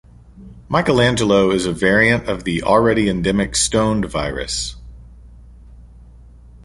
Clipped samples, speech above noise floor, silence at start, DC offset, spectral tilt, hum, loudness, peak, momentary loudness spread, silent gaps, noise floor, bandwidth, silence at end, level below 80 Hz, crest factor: under 0.1%; 26 dB; 0.35 s; under 0.1%; -4.5 dB/octave; none; -17 LUFS; 0 dBFS; 8 LU; none; -42 dBFS; 11.5 kHz; 0.1 s; -36 dBFS; 18 dB